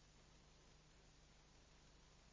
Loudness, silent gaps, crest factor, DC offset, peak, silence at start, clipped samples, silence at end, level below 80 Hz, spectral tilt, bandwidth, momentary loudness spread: -69 LUFS; none; 12 dB; under 0.1%; -56 dBFS; 0 s; under 0.1%; 0 s; -72 dBFS; -3.5 dB/octave; 8 kHz; 0 LU